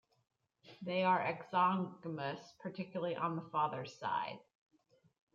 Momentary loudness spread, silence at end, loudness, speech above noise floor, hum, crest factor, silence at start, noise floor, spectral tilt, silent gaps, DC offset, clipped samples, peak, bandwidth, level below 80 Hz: 13 LU; 0.95 s; -37 LUFS; 26 dB; none; 18 dB; 0.65 s; -63 dBFS; -6.5 dB/octave; none; under 0.1%; under 0.1%; -20 dBFS; 7.4 kHz; -86 dBFS